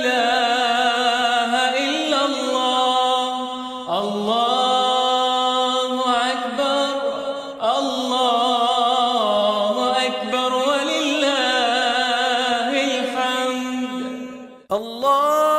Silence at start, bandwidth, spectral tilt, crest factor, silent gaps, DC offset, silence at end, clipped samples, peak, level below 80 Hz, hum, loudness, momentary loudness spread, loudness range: 0 s; 15 kHz; -2 dB/octave; 14 dB; none; under 0.1%; 0 s; under 0.1%; -6 dBFS; -66 dBFS; none; -19 LUFS; 8 LU; 2 LU